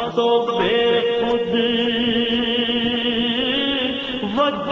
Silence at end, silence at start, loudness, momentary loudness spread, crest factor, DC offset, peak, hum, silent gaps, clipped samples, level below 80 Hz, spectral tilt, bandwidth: 0 s; 0 s; -19 LUFS; 2 LU; 14 dB; under 0.1%; -4 dBFS; none; none; under 0.1%; -48 dBFS; -5.5 dB/octave; 7.2 kHz